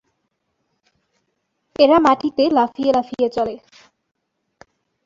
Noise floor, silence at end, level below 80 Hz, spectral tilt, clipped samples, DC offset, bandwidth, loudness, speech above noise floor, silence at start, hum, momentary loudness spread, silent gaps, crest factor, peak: -72 dBFS; 1.5 s; -58 dBFS; -5.5 dB/octave; under 0.1%; under 0.1%; 7.6 kHz; -17 LUFS; 56 dB; 1.8 s; none; 13 LU; none; 18 dB; -2 dBFS